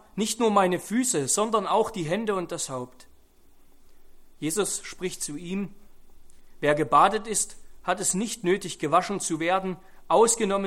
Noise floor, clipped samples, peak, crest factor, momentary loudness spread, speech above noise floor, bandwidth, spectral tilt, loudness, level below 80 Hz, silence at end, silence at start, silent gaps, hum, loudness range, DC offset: -53 dBFS; under 0.1%; -6 dBFS; 20 dB; 13 LU; 28 dB; 16.5 kHz; -3.5 dB/octave; -25 LUFS; -54 dBFS; 0 s; 0.15 s; none; none; 8 LU; under 0.1%